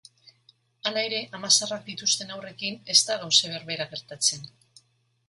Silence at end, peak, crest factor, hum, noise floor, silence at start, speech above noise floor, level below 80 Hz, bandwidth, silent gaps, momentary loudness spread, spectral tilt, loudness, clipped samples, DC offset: 0.8 s; -4 dBFS; 26 dB; none; -67 dBFS; 0.85 s; 40 dB; -74 dBFS; 12 kHz; none; 12 LU; -0.5 dB/octave; -24 LUFS; under 0.1%; under 0.1%